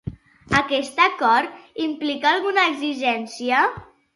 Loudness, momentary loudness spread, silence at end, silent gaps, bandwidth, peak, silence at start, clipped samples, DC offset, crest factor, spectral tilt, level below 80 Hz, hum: -20 LUFS; 10 LU; 0.35 s; none; 11.5 kHz; -2 dBFS; 0.05 s; under 0.1%; under 0.1%; 20 dB; -4 dB/octave; -52 dBFS; none